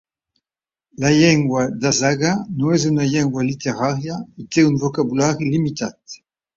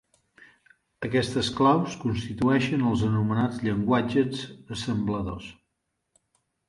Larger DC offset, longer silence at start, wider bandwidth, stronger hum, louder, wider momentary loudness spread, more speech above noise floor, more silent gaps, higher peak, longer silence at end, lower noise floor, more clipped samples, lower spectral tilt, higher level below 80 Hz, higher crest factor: neither; about the same, 1 s vs 1 s; second, 7.8 kHz vs 11.5 kHz; neither; first, -18 LUFS vs -26 LUFS; about the same, 14 LU vs 13 LU; first, over 72 dB vs 54 dB; neither; first, -2 dBFS vs -8 dBFS; second, 0.4 s vs 1.15 s; first, under -90 dBFS vs -79 dBFS; neither; second, -5 dB/octave vs -6.5 dB/octave; about the same, -52 dBFS vs -50 dBFS; about the same, 16 dB vs 18 dB